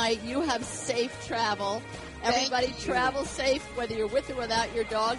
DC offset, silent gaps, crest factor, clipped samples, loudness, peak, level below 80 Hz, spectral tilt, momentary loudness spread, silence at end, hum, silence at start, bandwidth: under 0.1%; none; 18 dB; under 0.1%; -29 LUFS; -12 dBFS; -50 dBFS; -3 dB/octave; 5 LU; 0 s; none; 0 s; 11.5 kHz